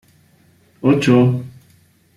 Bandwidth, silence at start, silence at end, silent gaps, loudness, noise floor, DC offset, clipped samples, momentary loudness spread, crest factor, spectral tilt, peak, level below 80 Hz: 12 kHz; 0.85 s; 0.65 s; none; -16 LUFS; -54 dBFS; under 0.1%; under 0.1%; 14 LU; 16 dB; -7.5 dB/octave; -2 dBFS; -54 dBFS